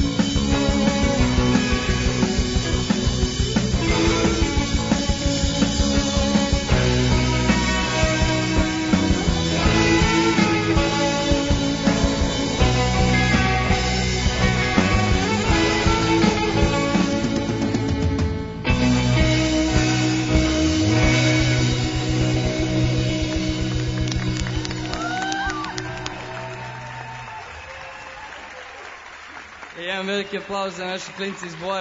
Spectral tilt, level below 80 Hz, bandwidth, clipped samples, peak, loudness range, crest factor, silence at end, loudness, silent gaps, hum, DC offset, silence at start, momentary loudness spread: -5 dB/octave; -28 dBFS; 7.8 kHz; under 0.1%; -4 dBFS; 10 LU; 16 dB; 0 s; -20 LUFS; none; none; under 0.1%; 0 s; 14 LU